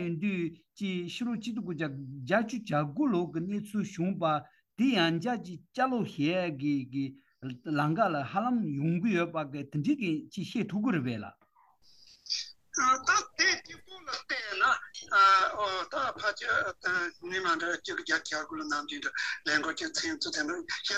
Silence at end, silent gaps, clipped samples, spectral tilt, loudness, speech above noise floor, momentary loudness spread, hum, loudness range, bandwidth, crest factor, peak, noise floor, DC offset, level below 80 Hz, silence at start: 0 s; none; under 0.1%; -4 dB/octave; -30 LUFS; 33 dB; 10 LU; none; 5 LU; 12.5 kHz; 18 dB; -12 dBFS; -63 dBFS; under 0.1%; -74 dBFS; 0 s